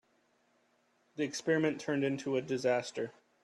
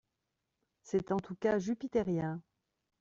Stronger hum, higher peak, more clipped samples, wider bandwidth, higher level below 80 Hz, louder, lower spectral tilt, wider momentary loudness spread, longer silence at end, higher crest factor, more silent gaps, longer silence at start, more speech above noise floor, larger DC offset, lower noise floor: neither; about the same, -18 dBFS vs -20 dBFS; neither; first, 12 kHz vs 7.8 kHz; second, -78 dBFS vs -66 dBFS; about the same, -34 LUFS vs -35 LUFS; second, -5 dB/octave vs -7.5 dB/octave; first, 10 LU vs 5 LU; second, 0.35 s vs 0.6 s; about the same, 18 dB vs 18 dB; neither; first, 1.15 s vs 0.85 s; second, 40 dB vs 52 dB; neither; second, -73 dBFS vs -86 dBFS